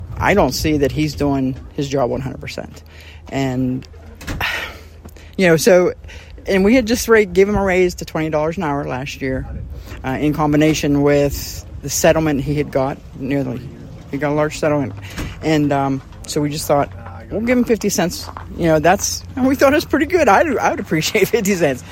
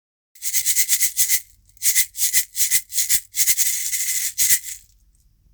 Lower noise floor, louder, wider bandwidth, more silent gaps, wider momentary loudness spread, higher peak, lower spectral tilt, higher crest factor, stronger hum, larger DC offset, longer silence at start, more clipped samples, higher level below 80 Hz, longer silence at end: second, -38 dBFS vs -57 dBFS; about the same, -17 LUFS vs -17 LUFS; second, 16.5 kHz vs over 20 kHz; neither; first, 15 LU vs 5 LU; about the same, 0 dBFS vs 0 dBFS; first, -5 dB/octave vs 4 dB/octave; about the same, 18 dB vs 22 dB; neither; neither; second, 0 s vs 0.4 s; neither; first, -36 dBFS vs -56 dBFS; second, 0 s vs 0.75 s